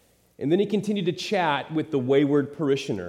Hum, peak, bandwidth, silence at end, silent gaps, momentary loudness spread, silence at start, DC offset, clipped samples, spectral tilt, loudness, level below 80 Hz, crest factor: none; -8 dBFS; 12.5 kHz; 0 s; none; 6 LU; 0.4 s; under 0.1%; under 0.1%; -6.5 dB/octave; -24 LUFS; -70 dBFS; 16 dB